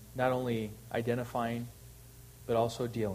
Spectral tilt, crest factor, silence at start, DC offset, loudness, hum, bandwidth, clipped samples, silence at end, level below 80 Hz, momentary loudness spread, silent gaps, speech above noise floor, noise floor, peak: -6.5 dB/octave; 18 dB; 0 s; under 0.1%; -34 LUFS; none; 15.5 kHz; under 0.1%; 0 s; -58 dBFS; 21 LU; none; 20 dB; -53 dBFS; -16 dBFS